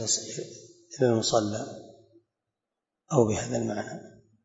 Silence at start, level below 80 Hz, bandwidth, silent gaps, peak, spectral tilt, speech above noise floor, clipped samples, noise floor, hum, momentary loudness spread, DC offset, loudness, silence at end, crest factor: 0 s; -64 dBFS; 8 kHz; none; -6 dBFS; -4.5 dB/octave; 60 dB; under 0.1%; -87 dBFS; none; 20 LU; under 0.1%; -28 LUFS; 0.35 s; 24 dB